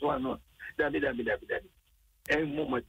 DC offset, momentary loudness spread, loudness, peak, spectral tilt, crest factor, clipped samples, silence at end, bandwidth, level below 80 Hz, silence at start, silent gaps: under 0.1%; 11 LU; -32 LUFS; -16 dBFS; -6 dB/octave; 16 dB; under 0.1%; 0.05 s; 16 kHz; -56 dBFS; 0 s; none